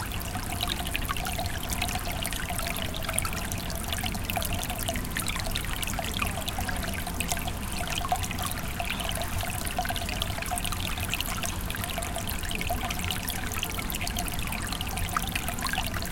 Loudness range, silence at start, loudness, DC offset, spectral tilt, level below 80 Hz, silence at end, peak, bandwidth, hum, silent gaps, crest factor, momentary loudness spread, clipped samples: 0 LU; 0 s; -30 LUFS; under 0.1%; -3 dB/octave; -36 dBFS; 0 s; -6 dBFS; 17 kHz; none; none; 26 dB; 2 LU; under 0.1%